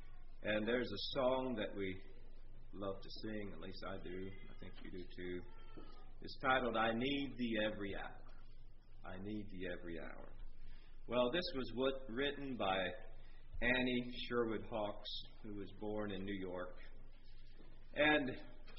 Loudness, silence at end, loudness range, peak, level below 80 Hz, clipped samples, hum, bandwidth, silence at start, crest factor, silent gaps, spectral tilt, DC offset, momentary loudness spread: -41 LUFS; 0 s; 9 LU; -20 dBFS; -52 dBFS; under 0.1%; none; 5.8 kHz; 0 s; 22 dB; none; -3 dB/octave; under 0.1%; 22 LU